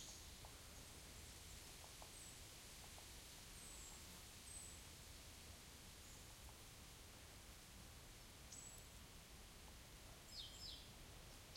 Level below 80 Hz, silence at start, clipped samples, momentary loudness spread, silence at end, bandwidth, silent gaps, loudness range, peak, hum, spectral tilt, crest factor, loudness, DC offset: -66 dBFS; 0 s; under 0.1%; 5 LU; 0 s; 16.5 kHz; none; 3 LU; -40 dBFS; none; -2 dB/octave; 18 dB; -58 LUFS; under 0.1%